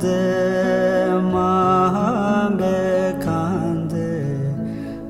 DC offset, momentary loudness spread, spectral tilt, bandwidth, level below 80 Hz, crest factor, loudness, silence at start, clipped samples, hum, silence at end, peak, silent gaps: under 0.1%; 7 LU; -7.5 dB/octave; 13 kHz; -46 dBFS; 12 dB; -19 LUFS; 0 s; under 0.1%; none; 0 s; -6 dBFS; none